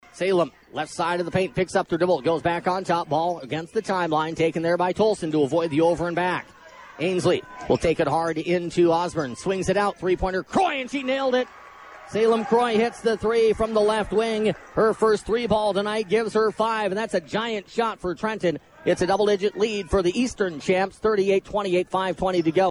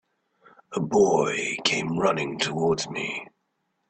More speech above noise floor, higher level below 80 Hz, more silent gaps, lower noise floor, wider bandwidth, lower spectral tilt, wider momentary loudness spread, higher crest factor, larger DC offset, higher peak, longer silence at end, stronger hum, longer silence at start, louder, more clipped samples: second, 21 dB vs 51 dB; first, -48 dBFS vs -62 dBFS; neither; second, -44 dBFS vs -75 dBFS; first, 11.5 kHz vs 8.8 kHz; first, -5.5 dB/octave vs -4 dB/octave; second, 6 LU vs 11 LU; second, 14 dB vs 20 dB; neither; about the same, -8 dBFS vs -6 dBFS; second, 0 s vs 0.65 s; neither; second, 0.15 s vs 0.7 s; about the same, -23 LUFS vs -24 LUFS; neither